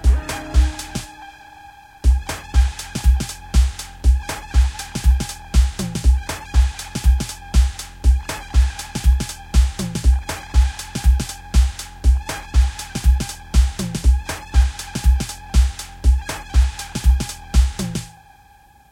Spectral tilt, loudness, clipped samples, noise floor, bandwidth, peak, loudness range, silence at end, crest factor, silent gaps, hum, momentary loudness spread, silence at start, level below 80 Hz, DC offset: -5 dB/octave; -21 LUFS; under 0.1%; -50 dBFS; 15 kHz; -4 dBFS; 1 LU; 0.85 s; 14 dB; none; none; 3 LU; 0 s; -18 dBFS; 0.1%